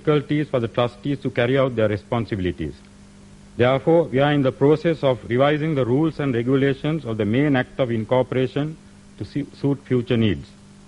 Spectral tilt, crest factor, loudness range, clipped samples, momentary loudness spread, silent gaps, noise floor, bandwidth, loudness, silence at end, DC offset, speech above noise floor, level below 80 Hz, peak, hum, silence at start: -8 dB/octave; 16 dB; 4 LU; under 0.1%; 9 LU; none; -45 dBFS; 11 kHz; -21 LUFS; 0.45 s; under 0.1%; 25 dB; -48 dBFS; -4 dBFS; none; 0 s